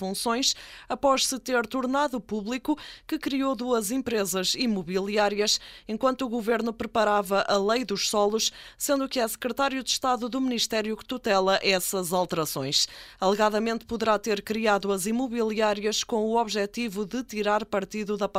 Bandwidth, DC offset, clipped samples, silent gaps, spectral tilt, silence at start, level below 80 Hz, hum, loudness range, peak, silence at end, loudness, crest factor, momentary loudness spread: 16 kHz; under 0.1%; under 0.1%; none; -3 dB/octave; 0 s; -58 dBFS; none; 2 LU; -8 dBFS; 0 s; -26 LUFS; 18 dB; 7 LU